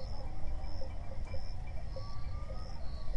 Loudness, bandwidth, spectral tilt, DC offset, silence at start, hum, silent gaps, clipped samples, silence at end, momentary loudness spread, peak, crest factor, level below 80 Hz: -45 LUFS; 6.2 kHz; -6.5 dB/octave; under 0.1%; 0 s; none; none; under 0.1%; 0 s; 1 LU; -22 dBFS; 12 dB; -40 dBFS